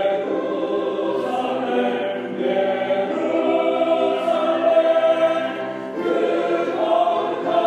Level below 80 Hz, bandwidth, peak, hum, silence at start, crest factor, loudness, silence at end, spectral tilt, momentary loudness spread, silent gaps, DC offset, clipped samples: -74 dBFS; 9.2 kHz; -6 dBFS; none; 0 s; 14 dB; -20 LUFS; 0 s; -6 dB/octave; 6 LU; none; under 0.1%; under 0.1%